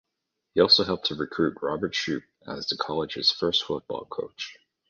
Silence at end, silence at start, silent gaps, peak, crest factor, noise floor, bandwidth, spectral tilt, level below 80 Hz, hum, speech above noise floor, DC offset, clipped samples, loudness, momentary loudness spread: 0.35 s; 0.55 s; none; -6 dBFS; 22 dB; -82 dBFS; 7.2 kHz; -4 dB/octave; -58 dBFS; none; 56 dB; under 0.1%; under 0.1%; -25 LUFS; 17 LU